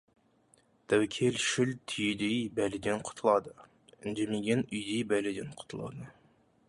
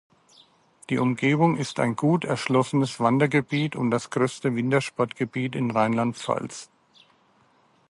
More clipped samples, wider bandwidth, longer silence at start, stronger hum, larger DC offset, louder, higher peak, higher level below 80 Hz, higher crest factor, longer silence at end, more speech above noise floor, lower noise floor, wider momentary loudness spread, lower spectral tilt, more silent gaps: neither; about the same, 11.5 kHz vs 11.5 kHz; about the same, 0.9 s vs 0.9 s; neither; neither; second, -32 LUFS vs -24 LUFS; second, -14 dBFS vs -6 dBFS; about the same, -66 dBFS vs -66 dBFS; about the same, 20 dB vs 18 dB; second, 0.6 s vs 1.25 s; about the same, 36 dB vs 38 dB; first, -67 dBFS vs -62 dBFS; first, 14 LU vs 7 LU; second, -4.5 dB/octave vs -6 dB/octave; neither